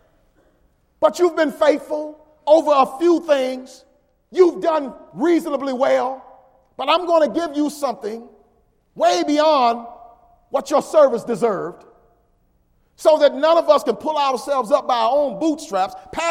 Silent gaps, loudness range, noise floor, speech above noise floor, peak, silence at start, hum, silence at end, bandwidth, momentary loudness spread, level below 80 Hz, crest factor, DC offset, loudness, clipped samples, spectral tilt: none; 3 LU; -61 dBFS; 43 dB; -2 dBFS; 1 s; none; 0 s; 15.5 kHz; 13 LU; -60 dBFS; 18 dB; under 0.1%; -18 LUFS; under 0.1%; -4 dB/octave